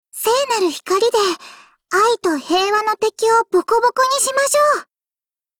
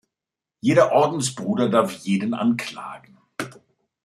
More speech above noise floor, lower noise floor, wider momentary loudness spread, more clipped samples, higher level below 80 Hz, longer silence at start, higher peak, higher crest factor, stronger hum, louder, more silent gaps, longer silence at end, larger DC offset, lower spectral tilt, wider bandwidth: first, over 74 dB vs 67 dB; about the same, under -90 dBFS vs -87 dBFS; second, 5 LU vs 18 LU; neither; first, -60 dBFS vs -68 dBFS; second, 0.15 s vs 0.65 s; about the same, -4 dBFS vs -2 dBFS; second, 12 dB vs 20 dB; neither; first, -16 LUFS vs -21 LUFS; neither; first, 0.75 s vs 0.5 s; neither; second, -1 dB/octave vs -5.5 dB/octave; first, over 20 kHz vs 14.5 kHz